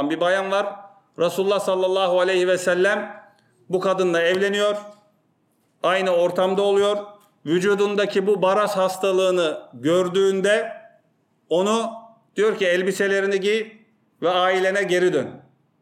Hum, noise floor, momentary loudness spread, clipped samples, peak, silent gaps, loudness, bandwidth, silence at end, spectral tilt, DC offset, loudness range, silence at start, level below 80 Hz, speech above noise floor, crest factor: none; -66 dBFS; 8 LU; under 0.1%; -8 dBFS; none; -21 LUFS; 15 kHz; 0.4 s; -4.5 dB/octave; under 0.1%; 2 LU; 0 s; -76 dBFS; 45 dB; 14 dB